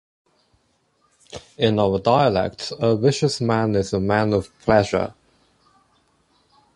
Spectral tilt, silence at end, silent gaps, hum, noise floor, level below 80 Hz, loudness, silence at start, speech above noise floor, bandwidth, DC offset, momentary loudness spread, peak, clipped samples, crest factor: -6 dB/octave; 1.65 s; none; none; -65 dBFS; -48 dBFS; -20 LUFS; 1.35 s; 46 dB; 11.5 kHz; under 0.1%; 9 LU; -4 dBFS; under 0.1%; 18 dB